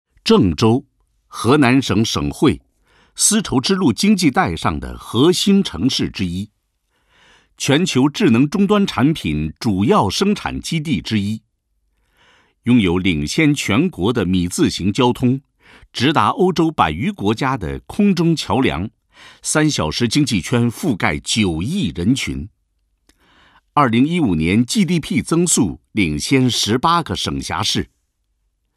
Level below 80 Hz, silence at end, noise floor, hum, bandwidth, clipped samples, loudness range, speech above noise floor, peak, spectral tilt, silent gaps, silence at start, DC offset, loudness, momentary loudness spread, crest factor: -40 dBFS; 0.9 s; -68 dBFS; none; 14.5 kHz; under 0.1%; 3 LU; 51 dB; 0 dBFS; -4.5 dB/octave; none; 0.25 s; under 0.1%; -17 LUFS; 8 LU; 18 dB